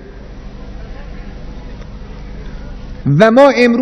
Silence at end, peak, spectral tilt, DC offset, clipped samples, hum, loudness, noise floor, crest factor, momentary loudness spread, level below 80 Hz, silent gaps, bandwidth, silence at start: 0 s; 0 dBFS; -7 dB/octave; under 0.1%; 0.8%; 50 Hz at -30 dBFS; -9 LUFS; -30 dBFS; 14 dB; 25 LU; -30 dBFS; none; 11 kHz; 0 s